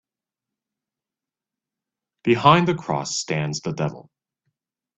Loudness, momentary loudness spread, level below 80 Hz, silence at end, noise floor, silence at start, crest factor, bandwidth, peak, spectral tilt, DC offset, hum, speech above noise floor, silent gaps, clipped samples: -21 LUFS; 12 LU; -60 dBFS; 0.95 s; -89 dBFS; 2.25 s; 24 dB; 8.4 kHz; 0 dBFS; -5 dB/octave; under 0.1%; none; 69 dB; none; under 0.1%